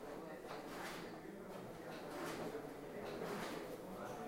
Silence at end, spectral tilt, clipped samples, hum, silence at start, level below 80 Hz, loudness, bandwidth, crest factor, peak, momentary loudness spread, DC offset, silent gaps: 0 s; -4.5 dB/octave; under 0.1%; none; 0 s; -68 dBFS; -49 LUFS; 16.5 kHz; 14 dB; -34 dBFS; 6 LU; under 0.1%; none